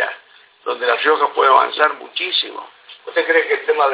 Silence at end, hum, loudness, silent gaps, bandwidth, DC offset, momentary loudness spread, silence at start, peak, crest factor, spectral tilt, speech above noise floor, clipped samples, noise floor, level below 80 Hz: 0 s; none; -16 LUFS; none; 4 kHz; under 0.1%; 16 LU; 0 s; 0 dBFS; 18 dB; -4 dB/octave; 31 dB; under 0.1%; -47 dBFS; -76 dBFS